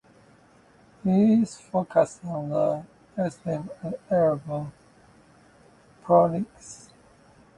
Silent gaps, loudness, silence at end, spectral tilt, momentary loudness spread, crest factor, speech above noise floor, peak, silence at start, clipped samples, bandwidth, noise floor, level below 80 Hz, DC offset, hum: none; -25 LUFS; 0.8 s; -8 dB/octave; 18 LU; 20 dB; 32 dB; -6 dBFS; 1.05 s; under 0.1%; 11 kHz; -56 dBFS; -62 dBFS; under 0.1%; none